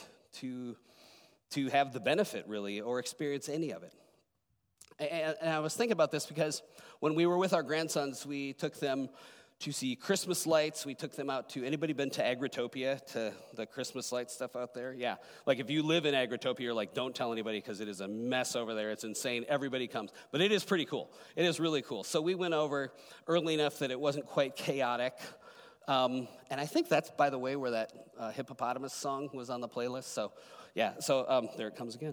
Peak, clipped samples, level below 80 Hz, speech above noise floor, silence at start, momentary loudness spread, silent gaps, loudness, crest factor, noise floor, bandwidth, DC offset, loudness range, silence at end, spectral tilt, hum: -14 dBFS; under 0.1%; -86 dBFS; 45 dB; 0 s; 11 LU; none; -35 LUFS; 20 dB; -80 dBFS; over 20 kHz; under 0.1%; 4 LU; 0 s; -4 dB/octave; none